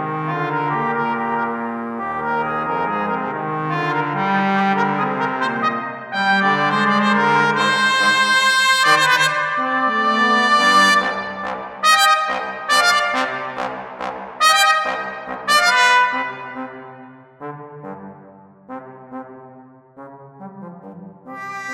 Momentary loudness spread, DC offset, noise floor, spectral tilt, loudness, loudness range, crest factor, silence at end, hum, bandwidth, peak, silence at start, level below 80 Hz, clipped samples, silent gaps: 22 LU; under 0.1%; -44 dBFS; -3 dB/octave; -17 LUFS; 20 LU; 18 dB; 0 s; none; 16 kHz; -2 dBFS; 0 s; -62 dBFS; under 0.1%; none